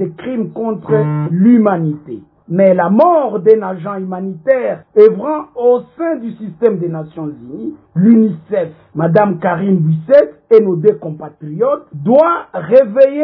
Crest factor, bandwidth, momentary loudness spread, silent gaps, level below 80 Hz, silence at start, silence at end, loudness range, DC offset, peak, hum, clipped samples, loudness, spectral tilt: 12 dB; 5.4 kHz; 14 LU; none; -60 dBFS; 0 s; 0 s; 3 LU; under 0.1%; 0 dBFS; none; 0.6%; -13 LUFS; -11.5 dB/octave